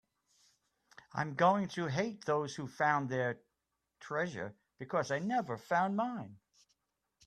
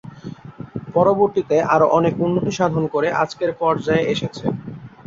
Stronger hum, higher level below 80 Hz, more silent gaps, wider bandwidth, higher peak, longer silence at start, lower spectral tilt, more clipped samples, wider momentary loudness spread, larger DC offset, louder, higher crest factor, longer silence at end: neither; second, -76 dBFS vs -52 dBFS; neither; first, 13 kHz vs 7.6 kHz; second, -14 dBFS vs -2 dBFS; first, 1.15 s vs 0.05 s; about the same, -6 dB/octave vs -6.5 dB/octave; neither; second, 15 LU vs 19 LU; neither; second, -35 LUFS vs -19 LUFS; about the same, 22 dB vs 18 dB; first, 0.9 s vs 0.2 s